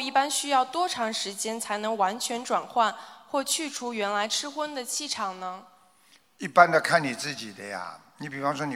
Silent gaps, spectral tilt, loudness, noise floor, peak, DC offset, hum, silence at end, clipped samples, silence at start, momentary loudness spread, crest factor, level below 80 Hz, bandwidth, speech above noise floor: none; -2.5 dB/octave; -27 LUFS; -61 dBFS; -4 dBFS; under 0.1%; none; 0 s; under 0.1%; 0 s; 15 LU; 24 dB; -78 dBFS; 16.5 kHz; 34 dB